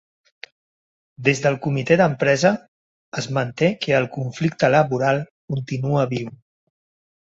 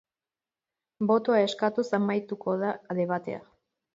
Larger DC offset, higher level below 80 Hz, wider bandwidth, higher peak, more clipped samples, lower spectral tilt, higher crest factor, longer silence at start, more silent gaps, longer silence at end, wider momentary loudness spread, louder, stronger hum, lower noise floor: neither; first, -58 dBFS vs -76 dBFS; about the same, 8 kHz vs 7.8 kHz; first, -2 dBFS vs -12 dBFS; neither; about the same, -6 dB/octave vs -6.5 dB/octave; about the same, 20 dB vs 18 dB; first, 1.2 s vs 1 s; first, 2.68-3.12 s, 5.31-5.48 s vs none; first, 0.85 s vs 0.55 s; first, 12 LU vs 9 LU; first, -20 LUFS vs -27 LUFS; neither; about the same, under -90 dBFS vs under -90 dBFS